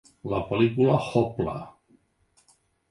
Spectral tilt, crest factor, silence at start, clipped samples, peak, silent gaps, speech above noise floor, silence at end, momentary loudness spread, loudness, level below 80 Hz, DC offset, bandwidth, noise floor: -8 dB/octave; 20 dB; 0.25 s; under 0.1%; -8 dBFS; none; 42 dB; 1.2 s; 13 LU; -25 LUFS; -52 dBFS; under 0.1%; 11.5 kHz; -66 dBFS